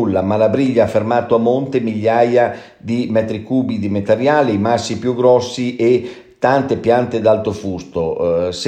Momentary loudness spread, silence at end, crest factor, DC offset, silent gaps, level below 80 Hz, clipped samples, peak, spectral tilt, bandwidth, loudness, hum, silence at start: 8 LU; 0 s; 14 dB; under 0.1%; none; -50 dBFS; under 0.1%; 0 dBFS; -6.5 dB/octave; 9.6 kHz; -16 LUFS; none; 0 s